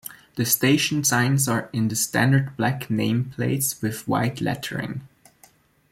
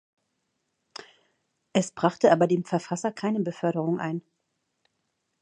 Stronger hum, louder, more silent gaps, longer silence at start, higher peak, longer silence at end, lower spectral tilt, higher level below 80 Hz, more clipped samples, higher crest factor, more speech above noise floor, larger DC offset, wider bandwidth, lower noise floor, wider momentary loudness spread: neither; first, -22 LUFS vs -26 LUFS; neither; second, 0.05 s vs 1.75 s; about the same, -6 dBFS vs -6 dBFS; second, 0.85 s vs 1.2 s; second, -4.5 dB/octave vs -6 dB/octave; first, -58 dBFS vs -74 dBFS; neither; second, 18 dB vs 24 dB; second, 34 dB vs 53 dB; neither; first, 16.5 kHz vs 10 kHz; second, -57 dBFS vs -78 dBFS; second, 9 LU vs 23 LU